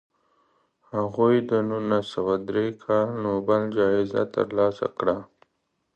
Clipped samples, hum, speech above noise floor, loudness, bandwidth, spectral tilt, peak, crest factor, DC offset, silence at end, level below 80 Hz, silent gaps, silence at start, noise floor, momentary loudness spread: under 0.1%; none; 51 dB; -24 LUFS; 8.4 kHz; -8 dB/octave; -8 dBFS; 18 dB; under 0.1%; 0.7 s; -62 dBFS; none; 0.95 s; -75 dBFS; 6 LU